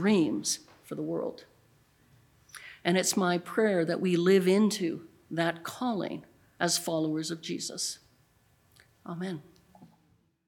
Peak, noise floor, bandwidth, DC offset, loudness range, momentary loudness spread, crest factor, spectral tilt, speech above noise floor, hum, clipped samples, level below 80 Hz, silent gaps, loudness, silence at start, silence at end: -10 dBFS; -68 dBFS; 19 kHz; under 0.1%; 7 LU; 18 LU; 22 dB; -4.5 dB/octave; 40 dB; none; under 0.1%; -74 dBFS; none; -29 LUFS; 0 s; 0.6 s